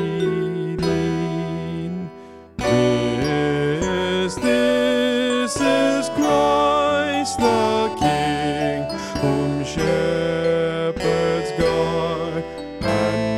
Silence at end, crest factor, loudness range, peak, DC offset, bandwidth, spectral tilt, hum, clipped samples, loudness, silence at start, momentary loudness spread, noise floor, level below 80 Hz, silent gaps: 0 s; 16 dB; 3 LU; -4 dBFS; 0.2%; 15 kHz; -5.5 dB/octave; none; under 0.1%; -20 LUFS; 0 s; 8 LU; -40 dBFS; -44 dBFS; none